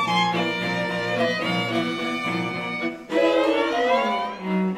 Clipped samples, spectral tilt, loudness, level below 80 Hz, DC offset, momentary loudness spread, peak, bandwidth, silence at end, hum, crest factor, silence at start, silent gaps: under 0.1%; -5.5 dB/octave; -23 LUFS; -64 dBFS; under 0.1%; 6 LU; -8 dBFS; 14.5 kHz; 0 s; none; 16 dB; 0 s; none